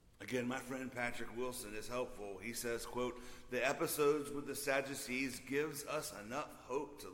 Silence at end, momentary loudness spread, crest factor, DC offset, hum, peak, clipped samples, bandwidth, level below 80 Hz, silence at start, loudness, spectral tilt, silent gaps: 0 s; 9 LU; 20 dB; under 0.1%; none; -20 dBFS; under 0.1%; 16.5 kHz; -62 dBFS; 0.05 s; -41 LUFS; -3.5 dB/octave; none